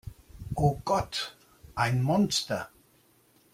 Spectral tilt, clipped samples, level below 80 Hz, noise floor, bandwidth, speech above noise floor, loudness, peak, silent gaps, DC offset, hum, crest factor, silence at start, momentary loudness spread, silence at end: -5 dB/octave; under 0.1%; -50 dBFS; -64 dBFS; 16 kHz; 36 dB; -29 LUFS; -10 dBFS; none; under 0.1%; none; 20 dB; 0.05 s; 17 LU; 0.85 s